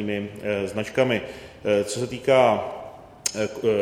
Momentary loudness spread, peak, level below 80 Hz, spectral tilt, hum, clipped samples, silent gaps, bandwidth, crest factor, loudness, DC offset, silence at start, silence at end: 15 LU; -4 dBFS; -56 dBFS; -4.5 dB/octave; none; under 0.1%; none; 17.5 kHz; 20 dB; -24 LUFS; under 0.1%; 0 s; 0 s